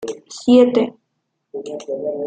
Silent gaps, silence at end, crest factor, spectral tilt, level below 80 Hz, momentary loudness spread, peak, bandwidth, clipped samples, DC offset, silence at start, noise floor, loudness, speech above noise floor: none; 0 s; 16 dB; -5.5 dB/octave; -66 dBFS; 19 LU; -2 dBFS; 9 kHz; under 0.1%; under 0.1%; 0 s; -73 dBFS; -16 LUFS; 57 dB